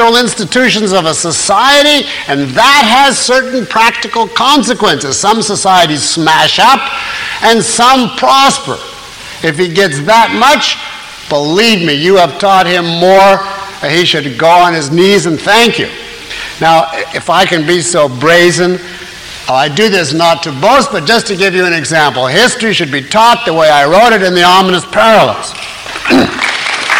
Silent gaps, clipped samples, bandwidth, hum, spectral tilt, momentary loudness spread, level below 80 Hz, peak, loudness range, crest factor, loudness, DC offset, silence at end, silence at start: none; 0.1%; 17 kHz; none; -3 dB/octave; 10 LU; -42 dBFS; 0 dBFS; 2 LU; 8 dB; -8 LUFS; under 0.1%; 0 s; 0 s